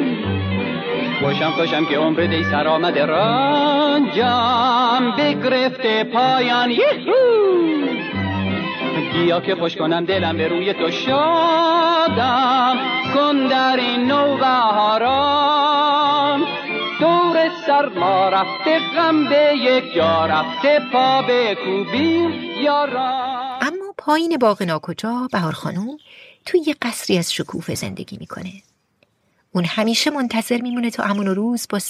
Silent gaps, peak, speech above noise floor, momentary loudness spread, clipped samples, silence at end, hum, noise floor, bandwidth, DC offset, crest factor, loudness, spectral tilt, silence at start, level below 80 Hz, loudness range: none; -4 dBFS; 46 dB; 8 LU; under 0.1%; 0 s; none; -63 dBFS; 14.5 kHz; under 0.1%; 14 dB; -18 LUFS; -5 dB/octave; 0 s; -60 dBFS; 7 LU